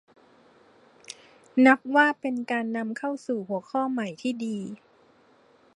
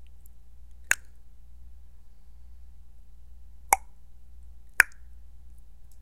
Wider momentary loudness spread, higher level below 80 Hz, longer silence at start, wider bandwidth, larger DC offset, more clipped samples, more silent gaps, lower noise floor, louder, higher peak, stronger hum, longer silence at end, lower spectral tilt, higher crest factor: first, 25 LU vs 6 LU; second, -80 dBFS vs -50 dBFS; first, 1.1 s vs 0.55 s; second, 11 kHz vs 16 kHz; second, under 0.1% vs 0.7%; neither; neither; first, -60 dBFS vs -50 dBFS; about the same, -25 LUFS vs -26 LUFS; second, -6 dBFS vs 0 dBFS; second, none vs 60 Hz at -60 dBFS; first, 1 s vs 0 s; first, -5 dB/octave vs 0 dB/octave; second, 22 dB vs 34 dB